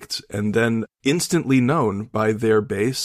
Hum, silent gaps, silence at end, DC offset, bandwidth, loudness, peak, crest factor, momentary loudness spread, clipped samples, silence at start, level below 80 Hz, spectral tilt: none; none; 0 s; under 0.1%; 15.5 kHz; -21 LUFS; -6 dBFS; 14 dB; 5 LU; under 0.1%; 0 s; -56 dBFS; -5 dB/octave